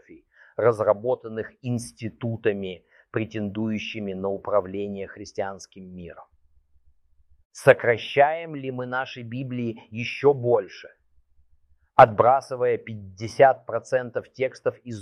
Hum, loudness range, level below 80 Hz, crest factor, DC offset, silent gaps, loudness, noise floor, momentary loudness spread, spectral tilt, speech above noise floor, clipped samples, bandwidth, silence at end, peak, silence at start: none; 9 LU; -62 dBFS; 24 dB; under 0.1%; 7.45-7.50 s; -24 LUFS; -61 dBFS; 17 LU; -6 dB/octave; 37 dB; under 0.1%; 12.5 kHz; 0 s; 0 dBFS; 0.1 s